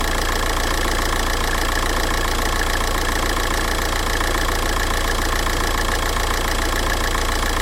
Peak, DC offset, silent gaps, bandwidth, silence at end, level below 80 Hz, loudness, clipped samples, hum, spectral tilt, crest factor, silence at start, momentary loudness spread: -6 dBFS; under 0.1%; none; 16.5 kHz; 0 s; -22 dBFS; -20 LUFS; under 0.1%; none; -3 dB/octave; 14 dB; 0 s; 0 LU